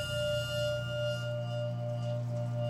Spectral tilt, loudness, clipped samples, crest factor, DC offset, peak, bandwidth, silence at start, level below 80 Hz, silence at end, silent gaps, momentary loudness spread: -5.5 dB/octave; -34 LUFS; under 0.1%; 12 dB; under 0.1%; -22 dBFS; 13.5 kHz; 0 s; -58 dBFS; 0 s; none; 3 LU